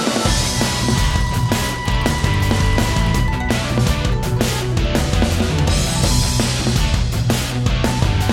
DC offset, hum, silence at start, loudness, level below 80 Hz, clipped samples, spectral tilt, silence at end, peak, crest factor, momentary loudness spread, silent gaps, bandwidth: under 0.1%; none; 0 s; -18 LUFS; -22 dBFS; under 0.1%; -4.5 dB/octave; 0 s; 0 dBFS; 16 dB; 2 LU; none; 17 kHz